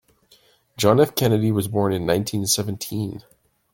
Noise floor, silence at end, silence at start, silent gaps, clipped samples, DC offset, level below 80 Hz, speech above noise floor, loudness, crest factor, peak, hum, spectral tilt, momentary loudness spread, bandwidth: -57 dBFS; 0.55 s; 0.8 s; none; under 0.1%; under 0.1%; -54 dBFS; 37 dB; -21 LUFS; 20 dB; -2 dBFS; none; -5 dB/octave; 11 LU; 17 kHz